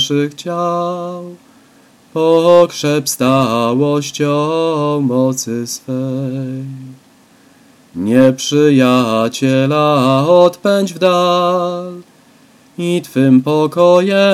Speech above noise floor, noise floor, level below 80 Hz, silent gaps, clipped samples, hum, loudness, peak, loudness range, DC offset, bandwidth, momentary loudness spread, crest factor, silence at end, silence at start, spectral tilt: 34 dB; -47 dBFS; -60 dBFS; none; under 0.1%; none; -13 LUFS; 0 dBFS; 6 LU; under 0.1%; 15.5 kHz; 13 LU; 14 dB; 0 s; 0 s; -5.5 dB/octave